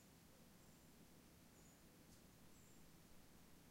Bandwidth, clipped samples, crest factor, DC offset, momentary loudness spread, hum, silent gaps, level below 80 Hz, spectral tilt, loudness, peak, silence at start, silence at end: 16 kHz; under 0.1%; 14 dB; under 0.1%; 1 LU; none; none; -76 dBFS; -4 dB/octave; -67 LUFS; -54 dBFS; 0 s; 0 s